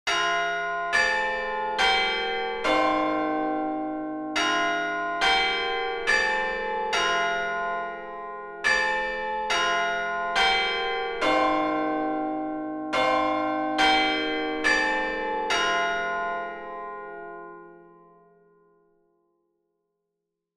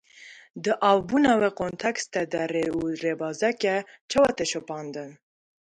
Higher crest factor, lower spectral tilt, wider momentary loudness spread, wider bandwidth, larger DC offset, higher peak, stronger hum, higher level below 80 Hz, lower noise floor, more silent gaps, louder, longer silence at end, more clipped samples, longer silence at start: about the same, 16 dB vs 18 dB; second, -2 dB/octave vs -4 dB/octave; about the same, 11 LU vs 13 LU; about the same, 12.5 kHz vs 11.5 kHz; neither; about the same, -10 dBFS vs -8 dBFS; neither; first, -54 dBFS vs -60 dBFS; first, -83 dBFS vs -49 dBFS; second, none vs 4.01-4.09 s; about the same, -25 LUFS vs -25 LUFS; first, 2.7 s vs 0.65 s; neither; second, 0.05 s vs 0.2 s